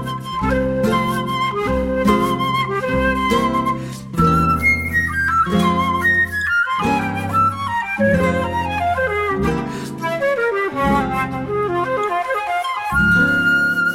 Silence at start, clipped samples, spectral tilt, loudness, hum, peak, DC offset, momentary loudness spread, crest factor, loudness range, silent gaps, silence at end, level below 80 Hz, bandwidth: 0 s; under 0.1%; -6 dB/octave; -18 LUFS; none; -2 dBFS; under 0.1%; 6 LU; 16 dB; 3 LU; none; 0 s; -36 dBFS; 16.5 kHz